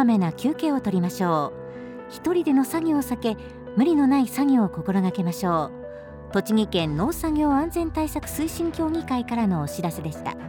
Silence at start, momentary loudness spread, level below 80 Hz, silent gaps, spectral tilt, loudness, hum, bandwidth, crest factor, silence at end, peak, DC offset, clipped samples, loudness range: 0 s; 11 LU; -46 dBFS; none; -6.5 dB/octave; -24 LUFS; none; 19.5 kHz; 14 dB; 0 s; -10 dBFS; under 0.1%; under 0.1%; 3 LU